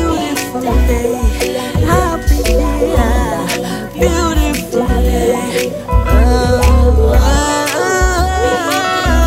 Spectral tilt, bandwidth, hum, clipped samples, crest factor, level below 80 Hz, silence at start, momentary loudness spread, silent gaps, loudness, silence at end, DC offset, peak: -5 dB/octave; 16.5 kHz; none; under 0.1%; 12 dB; -16 dBFS; 0 s; 6 LU; none; -14 LUFS; 0 s; under 0.1%; 0 dBFS